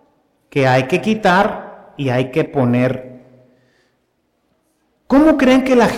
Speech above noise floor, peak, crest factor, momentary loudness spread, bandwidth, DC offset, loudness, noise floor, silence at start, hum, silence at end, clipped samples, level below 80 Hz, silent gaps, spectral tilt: 51 dB; -4 dBFS; 14 dB; 12 LU; 14.5 kHz; under 0.1%; -15 LUFS; -65 dBFS; 0.55 s; none; 0 s; under 0.1%; -46 dBFS; none; -6.5 dB/octave